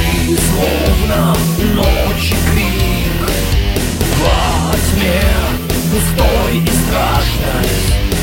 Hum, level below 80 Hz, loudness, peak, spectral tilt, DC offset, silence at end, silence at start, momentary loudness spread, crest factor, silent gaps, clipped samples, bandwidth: none; -18 dBFS; -14 LUFS; 0 dBFS; -4.5 dB/octave; under 0.1%; 0 s; 0 s; 3 LU; 12 dB; none; under 0.1%; 16.5 kHz